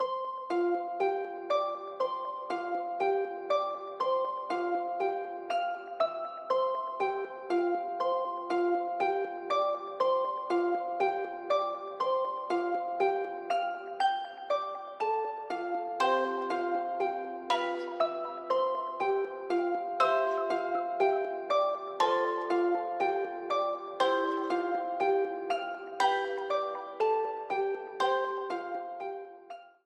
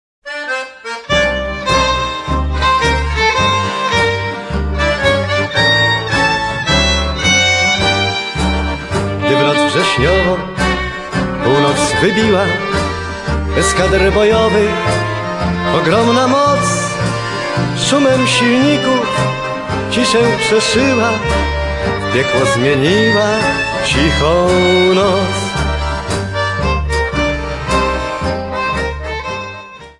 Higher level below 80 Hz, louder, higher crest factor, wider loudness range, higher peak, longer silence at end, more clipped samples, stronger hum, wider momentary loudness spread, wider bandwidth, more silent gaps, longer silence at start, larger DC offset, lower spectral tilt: second, -82 dBFS vs -26 dBFS; second, -32 LUFS vs -13 LUFS; about the same, 18 dB vs 14 dB; about the same, 3 LU vs 3 LU; second, -14 dBFS vs 0 dBFS; about the same, 0.15 s vs 0.1 s; neither; neither; about the same, 7 LU vs 8 LU; about the same, 10.5 kHz vs 11.5 kHz; neither; second, 0 s vs 0.25 s; neither; about the same, -3.5 dB/octave vs -4.5 dB/octave